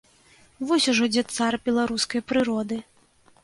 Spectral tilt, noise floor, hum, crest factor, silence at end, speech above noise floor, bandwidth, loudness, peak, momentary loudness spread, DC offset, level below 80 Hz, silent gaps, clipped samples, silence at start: -3 dB/octave; -58 dBFS; none; 16 dB; 0.6 s; 35 dB; 11.5 kHz; -24 LUFS; -10 dBFS; 10 LU; under 0.1%; -60 dBFS; none; under 0.1%; 0.6 s